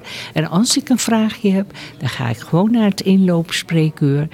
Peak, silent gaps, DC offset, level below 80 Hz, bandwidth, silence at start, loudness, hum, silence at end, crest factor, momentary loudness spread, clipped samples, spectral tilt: -4 dBFS; none; under 0.1%; -56 dBFS; 16 kHz; 0.05 s; -17 LUFS; none; 0.05 s; 12 dB; 9 LU; under 0.1%; -5.5 dB/octave